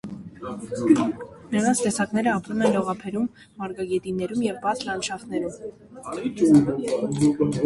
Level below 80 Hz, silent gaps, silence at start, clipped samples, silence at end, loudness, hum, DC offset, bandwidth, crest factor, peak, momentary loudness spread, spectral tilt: -58 dBFS; none; 0.05 s; under 0.1%; 0 s; -24 LUFS; none; under 0.1%; 11.5 kHz; 18 dB; -4 dBFS; 16 LU; -5.5 dB/octave